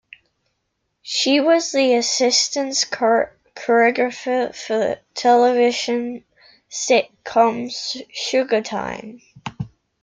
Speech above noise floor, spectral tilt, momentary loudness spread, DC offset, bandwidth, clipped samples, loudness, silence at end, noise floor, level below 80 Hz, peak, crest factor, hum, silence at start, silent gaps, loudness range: 55 dB; -2.5 dB/octave; 16 LU; under 0.1%; 9.6 kHz; under 0.1%; -19 LUFS; 0.35 s; -73 dBFS; -60 dBFS; -2 dBFS; 18 dB; none; 1.05 s; none; 4 LU